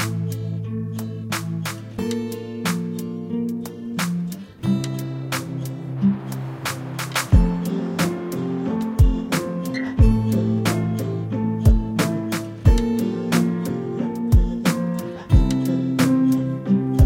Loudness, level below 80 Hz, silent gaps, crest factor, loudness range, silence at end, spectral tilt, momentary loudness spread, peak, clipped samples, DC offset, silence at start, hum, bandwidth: -22 LUFS; -26 dBFS; none; 20 dB; 6 LU; 0 s; -6.5 dB/octave; 10 LU; -2 dBFS; under 0.1%; under 0.1%; 0 s; none; 17 kHz